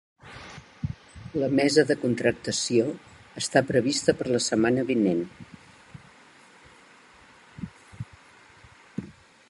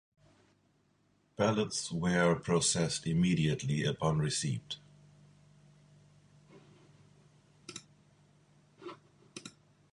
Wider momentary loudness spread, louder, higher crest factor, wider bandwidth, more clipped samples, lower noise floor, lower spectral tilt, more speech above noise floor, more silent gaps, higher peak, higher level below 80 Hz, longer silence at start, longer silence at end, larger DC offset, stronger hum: about the same, 21 LU vs 21 LU; first, -25 LUFS vs -32 LUFS; about the same, 22 dB vs 22 dB; about the same, 11.5 kHz vs 11.5 kHz; neither; second, -53 dBFS vs -72 dBFS; about the same, -4.5 dB/octave vs -4.5 dB/octave; second, 30 dB vs 41 dB; neither; first, -6 dBFS vs -14 dBFS; first, -56 dBFS vs -62 dBFS; second, 0.25 s vs 1.4 s; about the same, 0.4 s vs 0.45 s; neither; neither